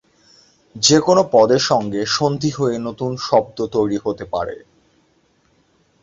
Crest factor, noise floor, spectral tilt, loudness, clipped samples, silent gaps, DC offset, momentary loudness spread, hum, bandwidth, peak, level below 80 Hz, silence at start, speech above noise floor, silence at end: 18 dB; -60 dBFS; -4 dB/octave; -17 LUFS; under 0.1%; none; under 0.1%; 11 LU; none; 8 kHz; -2 dBFS; -52 dBFS; 0.75 s; 42 dB; 1.45 s